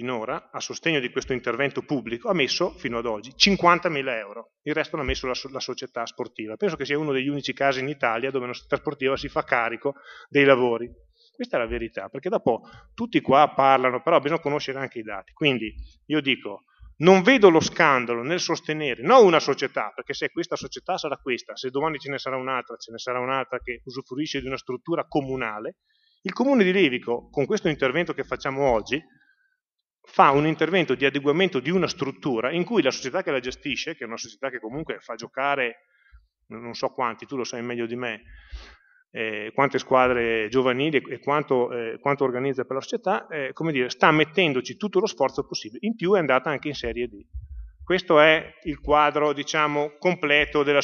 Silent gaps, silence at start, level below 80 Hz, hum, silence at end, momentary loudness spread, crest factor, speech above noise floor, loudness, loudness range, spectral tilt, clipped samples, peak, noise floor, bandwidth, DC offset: none; 0 s; -50 dBFS; none; 0 s; 14 LU; 24 dB; 59 dB; -23 LUFS; 9 LU; -5 dB/octave; under 0.1%; 0 dBFS; -83 dBFS; 7.2 kHz; under 0.1%